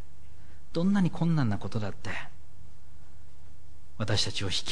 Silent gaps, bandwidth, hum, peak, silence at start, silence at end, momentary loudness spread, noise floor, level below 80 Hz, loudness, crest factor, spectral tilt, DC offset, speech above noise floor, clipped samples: none; 10.5 kHz; none; -12 dBFS; 0 s; 0 s; 12 LU; -54 dBFS; -52 dBFS; -30 LUFS; 18 dB; -5.5 dB/octave; 3%; 25 dB; under 0.1%